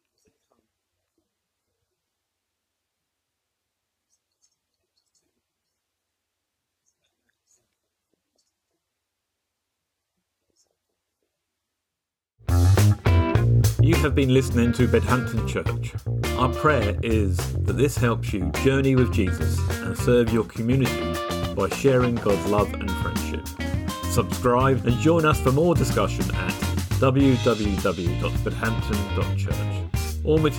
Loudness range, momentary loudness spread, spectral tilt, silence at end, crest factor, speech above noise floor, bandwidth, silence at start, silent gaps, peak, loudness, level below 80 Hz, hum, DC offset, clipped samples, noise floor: 4 LU; 8 LU; -6.5 dB/octave; 0 s; 16 dB; 65 dB; 19 kHz; 12.5 s; none; -8 dBFS; -22 LUFS; -36 dBFS; none; under 0.1%; under 0.1%; -86 dBFS